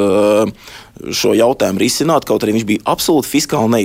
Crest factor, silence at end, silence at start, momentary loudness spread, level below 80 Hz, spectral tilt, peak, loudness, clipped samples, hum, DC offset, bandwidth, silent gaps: 12 dB; 0 s; 0 s; 7 LU; -46 dBFS; -4.5 dB/octave; -2 dBFS; -14 LUFS; under 0.1%; none; under 0.1%; 16.5 kHz; none